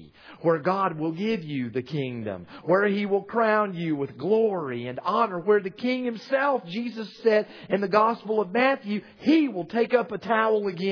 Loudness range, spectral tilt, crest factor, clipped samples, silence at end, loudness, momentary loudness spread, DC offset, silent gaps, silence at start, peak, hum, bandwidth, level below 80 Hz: 2 LU; -7.5 dB/octave; 20 dB; under 0.1%; 0 s; -25 LUFS; 8 LU; under 0.1%; none; 0 s; -6 dBFS; none; 5.4 kHz; -72 dBFS